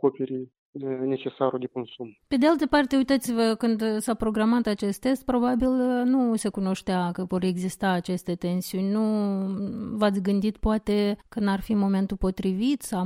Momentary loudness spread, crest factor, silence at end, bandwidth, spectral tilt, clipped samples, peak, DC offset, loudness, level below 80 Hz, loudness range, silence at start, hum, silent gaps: 8 LU; 16 dB; 0 s; 16 kHz; -6 dB/octave; under 0.1%; -8 dBFS; under 0.1%; -25 LUFS; -46 dBFS; 3 LU; 0.05 s; none; 0.58-0.73 s